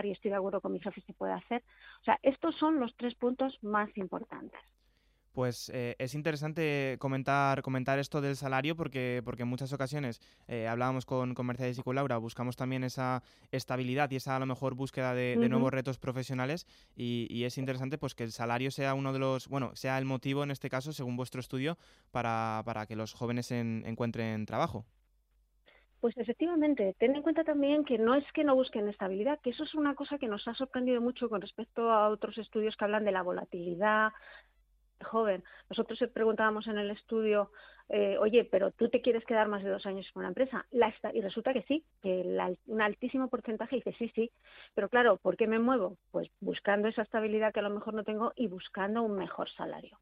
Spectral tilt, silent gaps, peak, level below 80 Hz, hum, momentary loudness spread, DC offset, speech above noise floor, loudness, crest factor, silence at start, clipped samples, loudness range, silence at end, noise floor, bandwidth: -6.5 dB/octave; none; -14 dBFS; -68 dBFS; none; 10 LU; under 0.1%; 39 dB; -33 LUFS; 20 dB; 0 s; under 0.1%; 5 LU; 0.15 s; -71 dBFS; 15 kHz